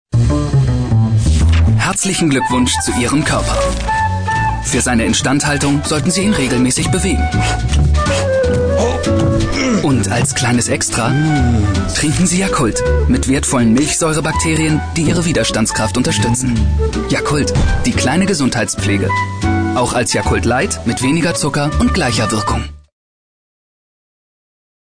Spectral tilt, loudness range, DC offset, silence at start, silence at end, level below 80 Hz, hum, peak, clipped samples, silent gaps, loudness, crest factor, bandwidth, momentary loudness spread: -4.5 dB/octave; 1 LU; under 0.1%; 0.15 s; 2.15 s; -22 dBFS; none; -4 dBFS; under 0.1%; none; -14 LUFS; 10 dB; 10.5 kHz; 3 LU